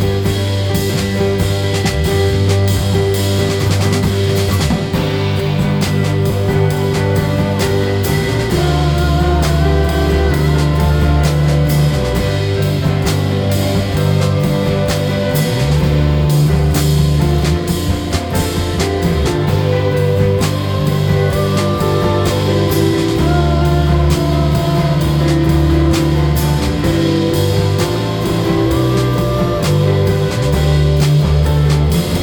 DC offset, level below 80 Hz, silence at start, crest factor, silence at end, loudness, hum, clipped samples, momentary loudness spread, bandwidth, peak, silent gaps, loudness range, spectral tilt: under 0.1%; -22 dBFS; 0 s; 12 dB; 0 s; -14 LUFS; none; under 0.1%; 3 LU; over 20 kHz; 0 dBFS; none; 2 LU; -6.5 dB/octave